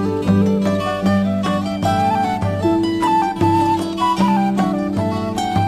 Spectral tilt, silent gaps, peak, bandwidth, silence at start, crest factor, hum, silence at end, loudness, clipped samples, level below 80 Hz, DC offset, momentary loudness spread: -7 dB/octave; none; -4 dBFS; 15 kHz; 0 s; 12 dB; none; 0 s; -18 LUFS; under 0.1%; -44 dBFS; under 0.1%; 4 LU